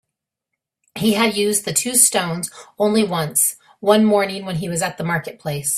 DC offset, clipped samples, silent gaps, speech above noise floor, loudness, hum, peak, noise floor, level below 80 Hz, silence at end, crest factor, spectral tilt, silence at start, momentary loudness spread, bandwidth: under 0.1%; under 0.1%; none; 63 dB; -18 LUFS; none; 0 dBFS; -82 dBFS; -58 dBFS; 0 s; 20 dB; -3 dB/octave; 0.95 s; 11 LU; 16 kHz